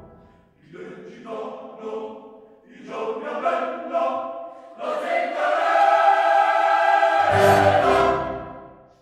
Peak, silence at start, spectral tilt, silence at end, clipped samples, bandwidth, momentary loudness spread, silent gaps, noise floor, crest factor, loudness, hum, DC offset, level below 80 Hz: -4 dBFS; 0 s; -5 dB/octave; 0.3 s; under 0.1%; 16 kHz; 21 LU; none; -53 dBFS; 18 dB; -20 LUFS; none; under 0.1%; -54 dBFS